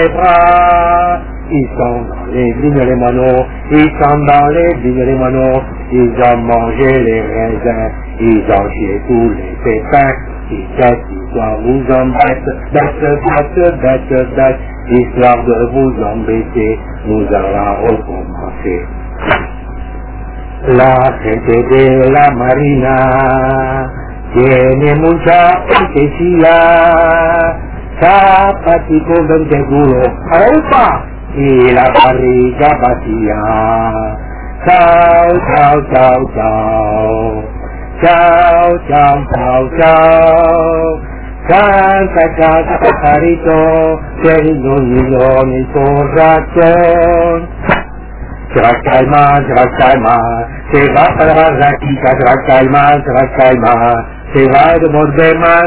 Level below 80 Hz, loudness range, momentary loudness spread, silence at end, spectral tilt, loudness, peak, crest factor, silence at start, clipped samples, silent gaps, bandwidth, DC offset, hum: -24 dBFS; 4 LU; 11 LU; 0 s; -10.5 dB/octave; -9 LUFS; 0 dBFS; 8 dB; 0 s; 1%; none; 4 kHz; 1%; none